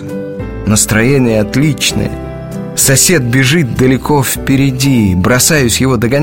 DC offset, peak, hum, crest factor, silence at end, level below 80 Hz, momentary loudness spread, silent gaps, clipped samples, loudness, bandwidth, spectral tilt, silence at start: 0.8%; 0 dBFS; none; 10 dB; 0 s; -30 dBFS; 12 LU; none; under 0.1%; -10 LUFS; 17.5 kHz; -4 dB/octave; 0 s